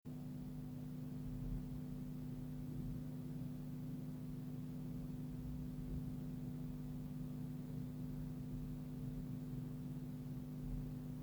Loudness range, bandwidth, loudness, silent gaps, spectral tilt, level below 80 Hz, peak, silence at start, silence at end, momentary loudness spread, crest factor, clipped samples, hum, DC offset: 0 LU; over 20 kHz; -48 LUFS; none; -8.5 dB/octave; -56 dBFS; -34 dBFS; 0.05 s; 0 s; 2 LU; 12 dB; under 0.1%; 50 Hz at -50 dBFS; under 0.1%